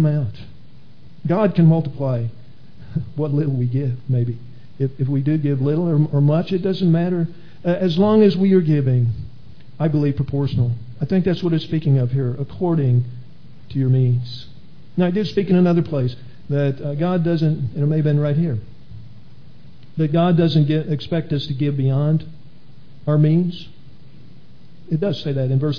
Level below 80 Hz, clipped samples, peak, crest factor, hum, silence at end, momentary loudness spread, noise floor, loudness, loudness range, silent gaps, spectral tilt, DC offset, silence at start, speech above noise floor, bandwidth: -50 dBFS; under 0.1%; -2 dBFS; 16 dB; none; 0 s; 12 LU; -47 dBFS; -19 LUFS; 4 LU; none; -10 dB/octave; 2%; 0 s; 29 dB; 5.4 kHz